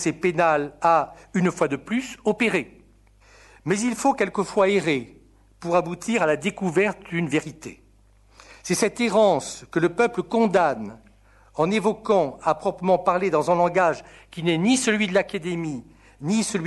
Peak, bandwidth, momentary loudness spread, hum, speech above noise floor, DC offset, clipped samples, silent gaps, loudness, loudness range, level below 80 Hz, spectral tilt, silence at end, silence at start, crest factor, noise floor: -4 dBFS; 12 kHz; 11 LU; none; 33 dB; under 0.1%; under 0.1%; none; -23 LUFS; 3 LU; -56 dBFS; -5 dB/octave; 0 s; 0 s; 18 dB; -56 dBFS